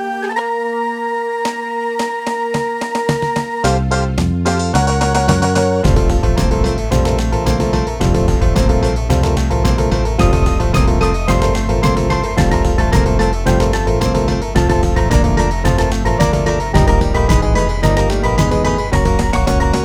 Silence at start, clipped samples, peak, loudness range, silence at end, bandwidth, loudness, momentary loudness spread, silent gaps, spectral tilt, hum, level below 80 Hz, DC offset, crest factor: 0 s; under 0.1%; 0 dBFS; 3 LU; 0 s; 14 kHz; -15 LUFS; 5 LU; none; -6 dB/octave; none; -18 dBFS; under 0.1%; 14 dB